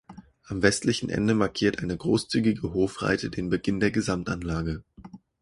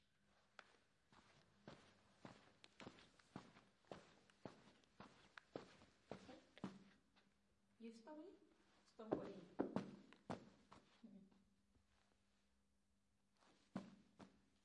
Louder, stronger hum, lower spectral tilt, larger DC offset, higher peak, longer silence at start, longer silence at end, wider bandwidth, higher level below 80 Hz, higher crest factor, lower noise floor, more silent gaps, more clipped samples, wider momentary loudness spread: first, -26 LUFS vs -57 LUFS; neither; about the same, -5.5 dB/octave vs -6.5 dB/octave; neither; first, -4 dBFS vs -26 dBFS; second, 0.1 s vs 0.3 s; about the same, 0.25 s vs 0.25 s; first, 11.5 kHz vs 10 kHz; first, -46 dBFS vs -88 dBFS; second, 22 dB vs 32 dB; second, -48 dBFS vs -86 dBFS; neither; neither; second, 6 LU vs 18 LU